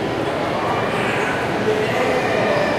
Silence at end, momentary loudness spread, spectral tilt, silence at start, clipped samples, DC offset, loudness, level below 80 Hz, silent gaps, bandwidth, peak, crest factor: 0 s; 3 LU; -5 dB/octave; 0 s; under 0.1%; under 0.1%; -19 LUFS; -46 dBFS; none; 15.5 kHz; -6 dBFS; 14 dB